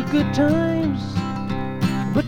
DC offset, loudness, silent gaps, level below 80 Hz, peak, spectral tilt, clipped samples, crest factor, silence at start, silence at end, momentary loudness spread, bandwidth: under 0.1%; -22 LUFS; none; -44 dBFS; -6 dBFS; -7.5 dB/octave; under 0.1%; 14 dB; 0 s; 0 s; 7 LU; 16 kHz